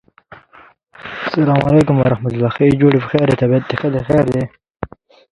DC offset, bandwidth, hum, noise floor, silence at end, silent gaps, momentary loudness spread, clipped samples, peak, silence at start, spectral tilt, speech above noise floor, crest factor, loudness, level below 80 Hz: under 0.1%; 10.5 kHz; none; -46 dBFS; 0.45 s; 4.70-4.75 s; 19 LU; under 0.1%; 0 dBFS; 1 s; -8.5 dB/octave; 33 dB; 16 dB; -15 LUFS; -42 dBFS